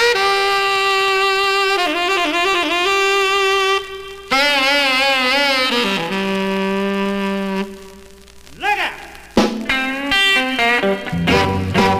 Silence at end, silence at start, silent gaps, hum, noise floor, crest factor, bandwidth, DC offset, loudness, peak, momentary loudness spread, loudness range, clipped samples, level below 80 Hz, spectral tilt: 0 s; 0 s; none; none; -40 dBFS; 16 dB; 16 kHz; 0.2%; -16 LUFS; -2 dBFS; 7 LU; 6 LU; under 0.1%; -44 dBFS; -3.5 dB/octave